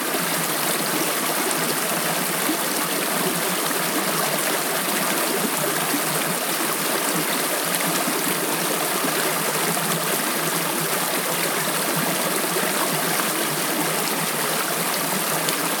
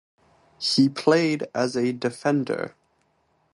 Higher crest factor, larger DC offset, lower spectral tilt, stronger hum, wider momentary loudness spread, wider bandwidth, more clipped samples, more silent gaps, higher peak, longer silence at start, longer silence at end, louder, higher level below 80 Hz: about the same, 22 dB vs 18 dB; neither; second, -2 dB/octave vs -5 dB/octave; neither; second, 1 LU vs 9 LU; first, over 20 kHz vs 11.5 kHz; neither; neither; first, -2 dBFS vs -6 dBFS; second, 0 s vs 0.6 s; second, 0 s vs 0.85 s; about the same, -21 LUFS vs -23 LUFS; second, -82 dBFS vs -70 dBFS